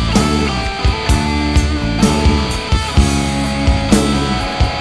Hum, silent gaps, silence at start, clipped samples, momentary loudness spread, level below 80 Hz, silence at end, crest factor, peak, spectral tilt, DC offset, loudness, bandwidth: none; none; 0 s; under 0.1%; 4 LU; -18 dBFS; 0 s; 14 dB; 0 dBFS; -5 dB/octave; 0.6%; -15 LUFS; 11 kHz